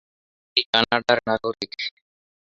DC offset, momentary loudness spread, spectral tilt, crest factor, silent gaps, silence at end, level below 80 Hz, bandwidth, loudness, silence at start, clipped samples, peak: under 0.1%; 11 LU; -4 dB/octave; 24 dB; 0.66-0.73 s; 0.55 s; -60 dBFS; 8 kHz; -22 LUFS; 0.55 s; under 0.1%; -2 dBFS